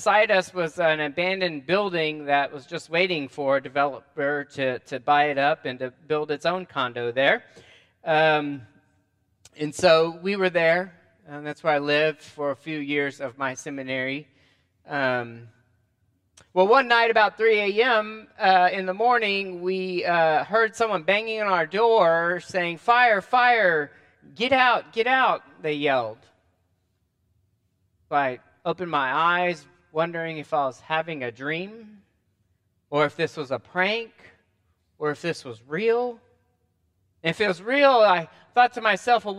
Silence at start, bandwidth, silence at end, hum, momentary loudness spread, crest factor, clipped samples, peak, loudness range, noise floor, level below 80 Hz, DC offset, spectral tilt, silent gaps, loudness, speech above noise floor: 0 s; 11.5 kHz; 0 s; none; 12 LU; 20 dB; under 0.1%; -4 dBFS; 8 LU; -71 dBFS; -72 dBFS; under 0.1%; -4.5 dB/octave; none; -23 LUFS; 48 dB